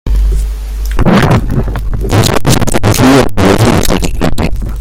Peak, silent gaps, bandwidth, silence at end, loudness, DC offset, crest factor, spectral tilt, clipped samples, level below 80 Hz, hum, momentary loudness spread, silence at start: 0 dBFS; none; 17 kHz; 0 s; -10 LUFS; under 0.1%; 8 dB; -5.5 dB/octave; 0.4%; -14 dBFS; none; 10 LU; 0.05 s